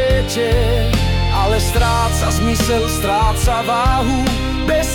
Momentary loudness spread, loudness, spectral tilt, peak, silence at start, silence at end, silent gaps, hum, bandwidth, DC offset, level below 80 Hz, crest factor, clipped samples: 2 LU; -16 LUFS; -5 dB/octave; -4 dBFS; 0 s; 0 s; none; none; 17.5 kHz; under 0.1%; -20 dBFS; 10 dB; under 0.1%